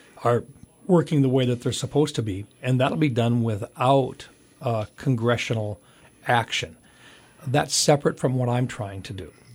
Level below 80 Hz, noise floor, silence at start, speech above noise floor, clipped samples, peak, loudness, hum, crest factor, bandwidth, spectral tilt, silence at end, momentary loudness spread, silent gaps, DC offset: -58 dBFS; -51 dBFS; 0.15 s; 28 dB; under 0.1%; -6 dBFS; -24 LUFS; none; 18 dB; 16 kHz; -5.5 dB/octave; 0 s; 14 LU; none; under 0.1%